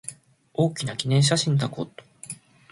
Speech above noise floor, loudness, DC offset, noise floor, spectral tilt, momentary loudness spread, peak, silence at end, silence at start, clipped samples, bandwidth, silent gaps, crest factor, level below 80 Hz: 20 dB; -23 LUFS; under 0.1%; -43 dBFS; -5 dB/octave; 19 LU; -8 dBFS; 0.4 s; 0.05 s; under 0.1%; 11.5 kHz; none; 18 dB; -60 dBFS